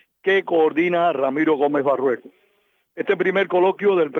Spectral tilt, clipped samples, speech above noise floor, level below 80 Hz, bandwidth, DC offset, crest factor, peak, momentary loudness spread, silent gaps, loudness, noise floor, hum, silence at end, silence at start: -7.5 dB/octave; under 0.1%; 46 dB; -80 dBFS; 6.2 kHz; under 0.1%; 14 dB; -6 dBFS; 5 LU; none; -20 LUFS; -65 dBFS; none; 0 s; 0.25 s